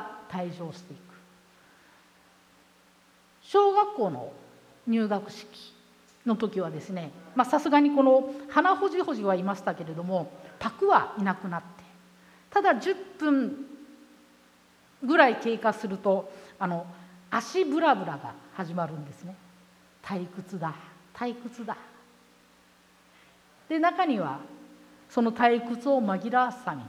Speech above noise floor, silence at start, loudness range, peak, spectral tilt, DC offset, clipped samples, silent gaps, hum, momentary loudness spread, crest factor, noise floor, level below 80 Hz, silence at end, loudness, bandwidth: 34 dB; 0 s; 13 LU; -6 dBFS; -6 dB/octave; under 0.1%; under 0.1%; none; none; 19 LU; 24 dB; -60 dBFS; -74 dBFS; 0 s; -27 LUFS; 15.5 kHz